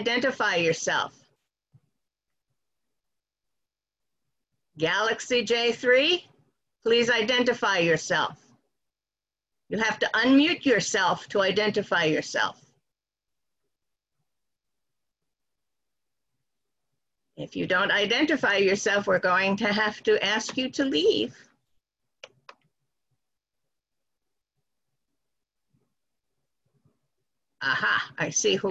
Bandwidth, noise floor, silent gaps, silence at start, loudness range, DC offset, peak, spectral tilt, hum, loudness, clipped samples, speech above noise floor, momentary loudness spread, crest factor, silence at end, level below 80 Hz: 8.6 kHz; under -90 dBFS; none; 0 s; 10 LU; under 0.1%; -10 dBFS; -3 dB/octave; none; -24 LUFS; under 0.1%; over 66 dB; 7 LU; 18 dB; 0 s; -68 dBFS